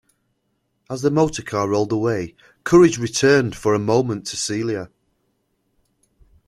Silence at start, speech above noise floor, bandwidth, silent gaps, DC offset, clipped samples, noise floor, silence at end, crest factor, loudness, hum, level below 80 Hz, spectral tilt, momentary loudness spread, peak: 0.9 s; 52 dB; 13 kHz; none; under 0.1%; under 0.1%; -70 dBFS; 1.6 s; 18 dB; -19 LUFS; none; -52 dBFS; -5 dB/octave; 15 LU; -2 dBFS